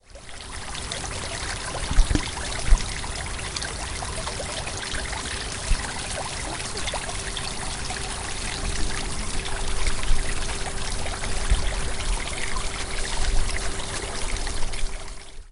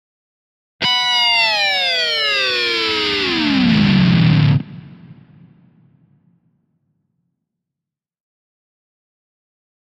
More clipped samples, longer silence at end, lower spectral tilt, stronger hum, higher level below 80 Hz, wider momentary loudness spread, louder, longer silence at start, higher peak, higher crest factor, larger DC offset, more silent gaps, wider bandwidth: neither; second, 0 s vs 4.7 s; second, -2.5 dB/octave vs -5 dB/octave; neither; first, -28 dBFS vs -46 dBFS; about the same, 4 LU vs 4 LU; second, -29 LUFS vs -14 LUFS; second, 0.1 s vs 0.8 s; about the same, -2 dBFS vs -2 dBFS; first, 22 dB vs 16 dB; neither; neither; about the same, 11.5 kHz vs 12.5 kHz